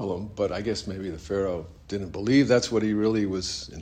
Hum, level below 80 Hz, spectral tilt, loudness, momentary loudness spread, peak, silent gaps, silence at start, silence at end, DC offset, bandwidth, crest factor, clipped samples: none; -50 dBFS; -5.5 dB/octave; -26 LUFS; 13 LU; -8 dBFS; none; 0 s; 0 s; under 0.1%; 10 kHz; 18 dB; under 0.1%